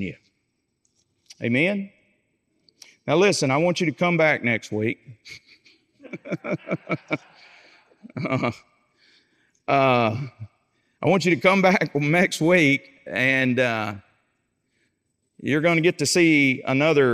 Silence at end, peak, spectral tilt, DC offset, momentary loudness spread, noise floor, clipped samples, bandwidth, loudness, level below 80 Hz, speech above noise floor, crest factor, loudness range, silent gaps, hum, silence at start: 0 s; -4 dBFS; -5 dB/octave; under 0.1%; 18 LU; -74 dBFS; under 0.1%; 15.5 kHz; -21 LUFS; -72 dBFS; 53 dB; 18 dB; 10 LU; none; none; 0 s